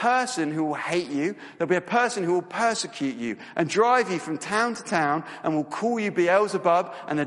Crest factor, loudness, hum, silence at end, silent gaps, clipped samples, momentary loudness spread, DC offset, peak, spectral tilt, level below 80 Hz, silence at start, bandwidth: 18 dB; -25 LUFS; none; 0 s; none; under 0.1%; 8 LU; under 0.1%; -8 dBFS; -4.5 dB/octave; -72 dBFS; 0 s; 11.5 kHz